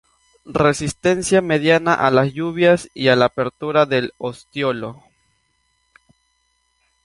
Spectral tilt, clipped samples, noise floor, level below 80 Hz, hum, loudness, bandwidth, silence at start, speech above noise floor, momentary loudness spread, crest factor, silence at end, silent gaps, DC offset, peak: -5 dB/octave; under 0.1%; -66 dBFS; -52 dBFS; none; -18 LUFS; 11.5 kHz; 0.45 s; 49 dB; 11 LU; 18 dB; 2.1 s; none; under 0.1%; 0 dBFS